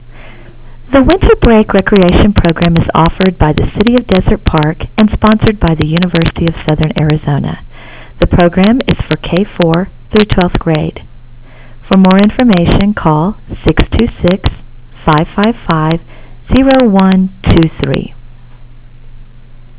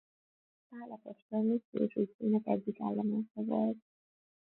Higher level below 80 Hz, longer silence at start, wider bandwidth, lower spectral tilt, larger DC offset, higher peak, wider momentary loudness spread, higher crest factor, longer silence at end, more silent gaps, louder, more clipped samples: first, -20 dBFS vs -80 dBFS; second, 0.05 s vs 0.7 s; about the same, 4 kHz vs 4.1 kHz; about the same, -11.5 dB/octave vs -12 dB/octave; neither; first, 0 dBFS vs -18 dBFS; second, 8 LU vs 16 LU; second, 10 dB vs 18 dB; second, 0.15 s vs 0.6 s; second, none vs 1.22-1.29 s, 1.65-1.73 s, 2.14-2.19 s, 3.31-3.35 s; first, -10 LUFS vs -34 LUFS; first, 0.1% vs under 0.1%